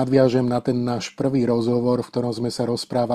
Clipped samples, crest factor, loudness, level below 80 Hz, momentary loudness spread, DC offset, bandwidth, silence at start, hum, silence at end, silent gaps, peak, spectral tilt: under 0.1%; 16 dB; -22 LUFS; -54 dBFS; 7 LU; under 0.1%; 13 kHz; 0 s; none; 0 s; none; -4 dBFS; -7 dB/octave